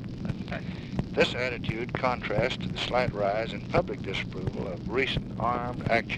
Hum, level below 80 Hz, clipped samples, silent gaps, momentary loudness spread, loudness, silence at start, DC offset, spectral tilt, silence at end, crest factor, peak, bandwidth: none; -46 dBFS; under 0.1%; none; 8 LU; -29 LUFS; 0 s; under 0.1%; -6 dB/octave; 0 s; 20 dB; -10 dBFS; 10.5 kHz